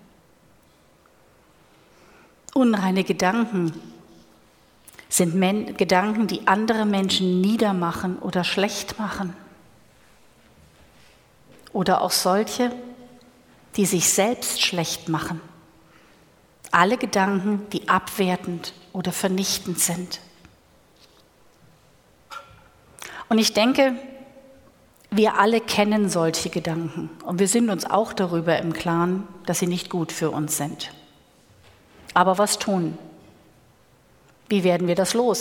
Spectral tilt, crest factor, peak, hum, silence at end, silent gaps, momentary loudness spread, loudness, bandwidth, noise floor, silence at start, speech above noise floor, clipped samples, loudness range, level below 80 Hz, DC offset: -4 dB/octave; 24 dB; 0 dBFS; none; 0 s; none; 13 LU; -22 LUFS; 18.5 kHz; -57 dBFS; 2.55 s; 35 dB; under 0.1%; 6 LU; -60 dBFS; under 0.1%